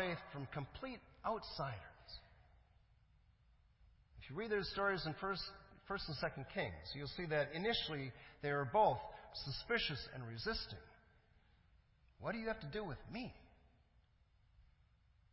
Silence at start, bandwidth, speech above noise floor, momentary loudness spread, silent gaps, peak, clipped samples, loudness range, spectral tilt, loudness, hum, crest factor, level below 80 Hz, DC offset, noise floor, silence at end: 0 s; 5.8 kHz; 30 dB; 13 LU; none; -22 dBFS; under 0.1%; 9 LU; -8 dB/octave; -42 LUFS; none; 22 dB; -64 dBFS; under 0.1%; -73 dBFS; 0.7 s